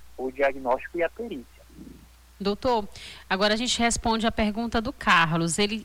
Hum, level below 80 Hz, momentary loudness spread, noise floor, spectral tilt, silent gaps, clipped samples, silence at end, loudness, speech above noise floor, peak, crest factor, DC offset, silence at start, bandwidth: none; -44 dBFS; 15 LU; -50 dBFS; -3.5 dB/octave; none; under 0.1%; 0 s; -25 LUFS; 25 dB; -10 dBFS; 16 dB; under 0.1%; 0 s; 19 kHz